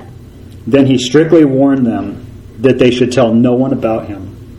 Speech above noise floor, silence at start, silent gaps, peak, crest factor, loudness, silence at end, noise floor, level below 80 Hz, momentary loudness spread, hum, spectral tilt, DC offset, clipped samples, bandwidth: 22 dB; 0 s; none; 0 dBFS; 12 dB; -11 LUFS; 0.05 s; -33 dBFS; -40 dBFS; 17 LU; none; -6.5 dB/octave; under 0.1%; 0.3%; 11.5 kHz